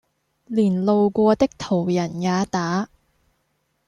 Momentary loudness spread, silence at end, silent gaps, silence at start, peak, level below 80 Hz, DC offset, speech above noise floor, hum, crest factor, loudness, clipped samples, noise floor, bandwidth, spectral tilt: 8 LU; 1 s; none; 0.5 s; -4 dBFS; -56 dBFS; under 0.1%; 50 dB; none; 18 dB; -21 LUFS; under 0.1%; -70 dBFS; 10.5 kHz; -7 dB/octave